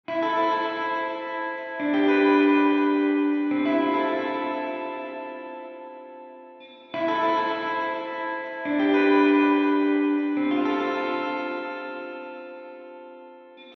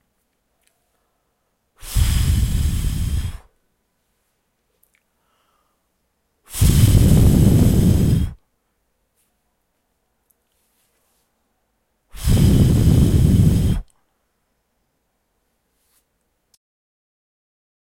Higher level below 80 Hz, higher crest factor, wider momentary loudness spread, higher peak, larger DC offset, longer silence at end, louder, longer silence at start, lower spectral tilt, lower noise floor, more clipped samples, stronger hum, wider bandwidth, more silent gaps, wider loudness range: second, -80 dBFS vs -26 dBFS; about the same, 16 dB vs 18 dB; first, 21 LU vs 14 LU; second, -10 dBFS vs -2 dBFS; neither; second, 0 s vs 4.2 s; second, -24 LUFS vs -17 LUFS; second, 0.1 s vs 1.85 s; about the same, -6 dB/octave vs -6.5 dB/octave; second, -46 dBFS vs -70 dBFS; neither; neither; second, 6 kHz vs 16.5 kHz; neither; second, 7 LU vs 12 LU